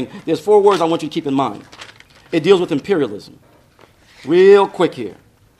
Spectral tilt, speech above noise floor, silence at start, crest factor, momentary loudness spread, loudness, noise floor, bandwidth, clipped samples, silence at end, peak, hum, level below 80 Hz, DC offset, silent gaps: -6 dB/octave; 35 dB; 0 s; 16 dB; 20 LU; -15 LUFS; -49 dBFS; 11.5 kHz; under 0.1%; 0.45 s; 0 dBFS; none; -60 dBFS; under 0.1%; none